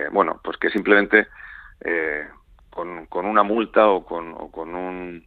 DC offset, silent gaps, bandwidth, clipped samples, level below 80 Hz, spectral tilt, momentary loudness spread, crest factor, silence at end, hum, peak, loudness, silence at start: under 0.1%; none; 4.7 kHz; under 0.1%; -52 dBFS; -7.5 dB/octave; 17 LU; 22 dB; 0.05 s; none; 0 dBFS; -20 LUFS; 0 s